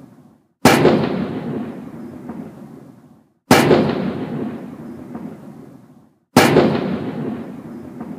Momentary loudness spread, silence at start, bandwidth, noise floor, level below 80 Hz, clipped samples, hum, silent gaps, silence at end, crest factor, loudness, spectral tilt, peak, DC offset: 22 LU; 0.65 s; 15.5 kHz; -50 dBFS; -52 dBFS; under 0.1%; none; none; 0 s; 20 dB; -17 LUFS; -5 dB/octave; 0 dBFS; under 0.1%